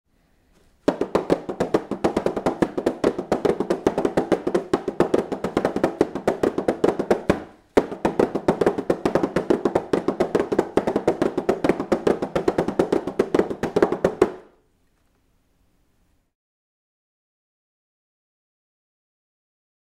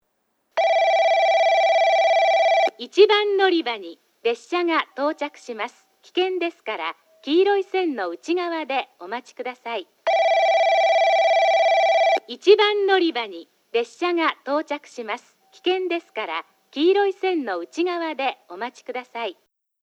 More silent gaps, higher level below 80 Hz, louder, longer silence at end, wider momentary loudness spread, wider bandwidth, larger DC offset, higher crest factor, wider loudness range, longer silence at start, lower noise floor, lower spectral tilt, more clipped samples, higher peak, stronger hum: neither; first, -50 dBFS vs -84 dBFS; about the same, -23 LUFS vs -21 LUFS; first, 5.55 s vs 0.5 s; second, 3 LU vs 14 LU; first, 15.5 kHz vs 8.6 kHz; neither; first, 24 dB vs 18 dB; second, 3 LU vs 7 LU; first, 0.9 s vs 0.55 s; second, -64 dBFS vs -70 dBFS; first, -6.5 dB/octave vs -2 dB/octave; neither; about the same, 0 dBFS vs -2 dBFS; neither